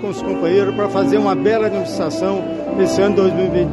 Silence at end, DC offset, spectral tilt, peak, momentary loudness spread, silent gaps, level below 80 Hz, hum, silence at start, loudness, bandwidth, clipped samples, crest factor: 0 s; under 0.1%; -6.5 dB/octave; -4 dBFS; 6 LU; none; -44 dBFS; none; 0 s; -17 LUFS; 11.5 kHz; under 0.1%; 12 dB